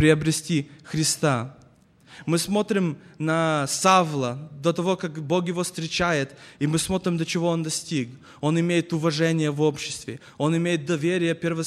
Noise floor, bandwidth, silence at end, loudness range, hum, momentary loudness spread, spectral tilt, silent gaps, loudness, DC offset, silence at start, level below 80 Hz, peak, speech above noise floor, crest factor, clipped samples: -55 dBFS; 14 kHz; 0 s; 2 LU; none; 8 LU; -5 dB/octave; none; -24 LUFS; under 0.1%; 0 s; -56 dBFS; -4 dBFS; 31 dB; 20 dB; under 0.1%